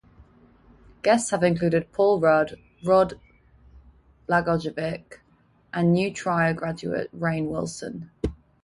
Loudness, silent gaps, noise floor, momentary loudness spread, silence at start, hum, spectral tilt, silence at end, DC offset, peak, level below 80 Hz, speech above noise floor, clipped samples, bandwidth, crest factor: -24 LUFS; none; -61 dBFS; 12 LU; 1.05 s; none; -6 dB/octave; 0.3 s; under 0.1%; -6 dBFS; -48 dBFS; 38 dB; under 0.1%; 11.5 kHz; 18 dB